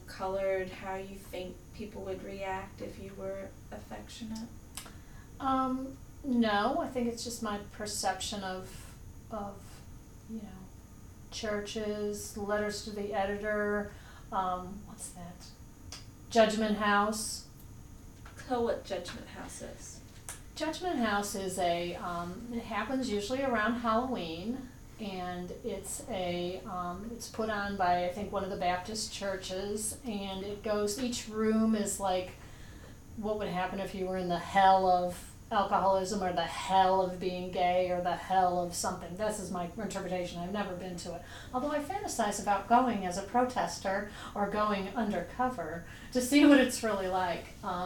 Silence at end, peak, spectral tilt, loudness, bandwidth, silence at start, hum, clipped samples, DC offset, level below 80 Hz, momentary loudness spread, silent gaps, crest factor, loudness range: 0 s; -10 dBFS; -4 dB/octave; -32 LUFS; 19 kHz; 0 s; none; under 0.1%; under 0.1%; -54 dBFS; 18 LU; none; 22 dB; 10 LU